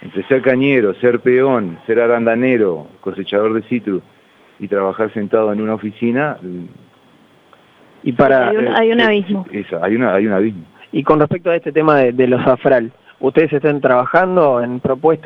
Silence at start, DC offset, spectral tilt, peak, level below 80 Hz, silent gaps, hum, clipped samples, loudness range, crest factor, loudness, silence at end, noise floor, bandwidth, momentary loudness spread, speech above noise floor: 0 s; under 0.1%; -9 dB/octave; 0 dBFS; -54 dBFS; none; none; under 0.1%; 6 LU; 14 dB; -15 LUFS; 0.05 s; -49 dBFS; 5.6 kHz; 10 LU; 35 dB